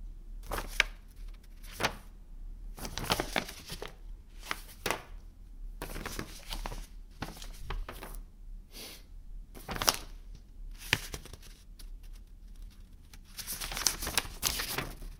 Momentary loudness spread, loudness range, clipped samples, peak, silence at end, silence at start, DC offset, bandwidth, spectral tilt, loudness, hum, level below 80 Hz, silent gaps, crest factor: 23 LU; 8 LU; under 0.1%; -4 dBFS; 0 s; 0 s; under 0.1%; 18 kHz; -1.5 dB/octave; -35 LUFS; none; -46 dBFS; none; 36 dB